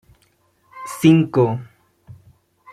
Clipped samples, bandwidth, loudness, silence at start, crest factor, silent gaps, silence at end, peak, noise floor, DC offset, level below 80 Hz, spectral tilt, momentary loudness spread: under 0.1%; 15 kHz; -17 LUFS; 0.75 s; 18 dB; none; 0.6 s; -2 dBFS; -61 dBFS; under 0.1%; -58 dBFS; -7 dB/octave; 19 LU